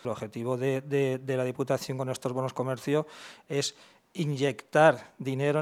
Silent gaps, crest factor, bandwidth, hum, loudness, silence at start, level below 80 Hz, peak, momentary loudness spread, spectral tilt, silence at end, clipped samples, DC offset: none; 22 dB; 15.5 kHz; none; -29 LUFS; 0.05 s; -76 dBFS; -6 dBFS; 12 LU; -5.5 dB/octave; 0 s; under 0.1%; under 0.1%